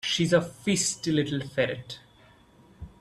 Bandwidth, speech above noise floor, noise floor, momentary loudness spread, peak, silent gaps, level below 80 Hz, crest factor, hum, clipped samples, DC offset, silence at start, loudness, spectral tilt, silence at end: 14 kHz; 30 dB; -57 dBFS; 20 LU; -10 dBFS; none; -58 dBFS; 20 dB; none; under 0.1%; under 0.1%; 0.05 s; -27 LUFS; -4 dB/octave; 0.1 s